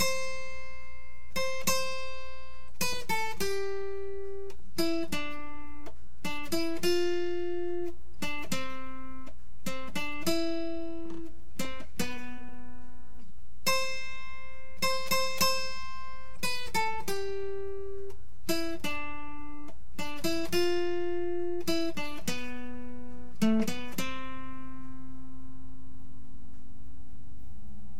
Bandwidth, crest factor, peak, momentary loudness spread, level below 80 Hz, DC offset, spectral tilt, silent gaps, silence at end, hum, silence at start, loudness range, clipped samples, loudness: 16 kHz; 22 dB; -12 dBFS; 21 LU; -52 dBFS; 5%; -3.5 dB/octave; none; 0 s; none; 0 s; 5 LU; under 0.1%; -34 LUFS